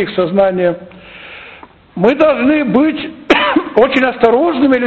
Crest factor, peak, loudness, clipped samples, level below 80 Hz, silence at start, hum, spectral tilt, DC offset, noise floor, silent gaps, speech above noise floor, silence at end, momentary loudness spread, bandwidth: 12 dB; 0 dBFS; -12 LUFS; under 0.1%; -46 dBFS; 0 s; none; -7 dB/octave; under 0.1%; -38 dBFS; none; 26 dB; 0 s; 20 LU; 7.4 kHz